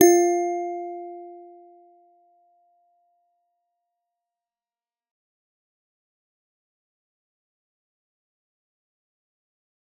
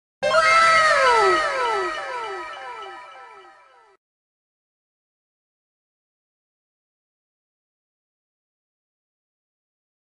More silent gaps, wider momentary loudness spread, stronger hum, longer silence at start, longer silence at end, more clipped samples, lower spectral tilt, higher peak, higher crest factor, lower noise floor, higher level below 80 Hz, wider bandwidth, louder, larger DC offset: neither; first, 25 LU vs 21 LU; neither; second, 0 s vs 0.2 s; first, 8.55 s vs 6.65 s; neither; first, -3.5 dB/octave vs -1.5 dB/octave; about the same, -2 dBFS vs -4 dBFS; first, 28 dB vs 20 dB; first, under -90 dBFS vs -52 dBFS; second, -84 dBFS vs -60 dBFS; first, 16 kHz vs 10.5 kHz; second, -23 LUFS vs -18 LUFS; neither